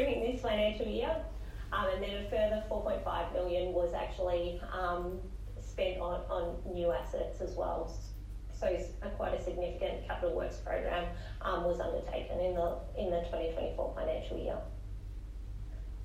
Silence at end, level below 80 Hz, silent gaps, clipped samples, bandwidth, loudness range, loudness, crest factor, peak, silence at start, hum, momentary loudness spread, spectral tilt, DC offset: 0 s; -42 dBFS; none; under 0.1%; 13.5 kHz; 3 LU; -36 LUFS; 16 dB; -20 dBFS; 0 s; none; 13 LU; -6.5 dB/octave; under 0.1%